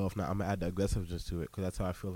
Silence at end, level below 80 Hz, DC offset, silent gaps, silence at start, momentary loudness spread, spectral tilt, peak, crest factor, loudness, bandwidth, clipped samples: 0 s; -44 dBFS; under 0.1%; none; 0 s; 5 LU; -6.5 dB/octave; -18 dBFS; 16 dB; -36 LUFS; 17 kHz; under 0.1%